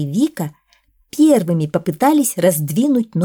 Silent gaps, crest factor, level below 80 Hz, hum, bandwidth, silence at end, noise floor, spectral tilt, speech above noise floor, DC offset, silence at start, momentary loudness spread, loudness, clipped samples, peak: none; 14 dB; -60 dBFS; none; 19.5 kHz; 0 s; -58 dBFS; -6 dB/octave; 42 dB; under 0.1%; 0 s; 11 LU; -16 LUFS; under 0.1%; -2 dBFS